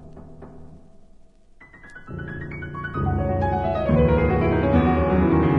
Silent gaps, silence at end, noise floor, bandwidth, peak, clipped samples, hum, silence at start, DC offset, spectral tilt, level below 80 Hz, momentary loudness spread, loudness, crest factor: none; 0 s; -49 dBFS; 5.4 kHz; -6 dBFS; under 0.1%; none; 0 s; under 0.1%; -10 dB/octave; -34 dBFS; 18 LU; -21 LUFS; 16 dB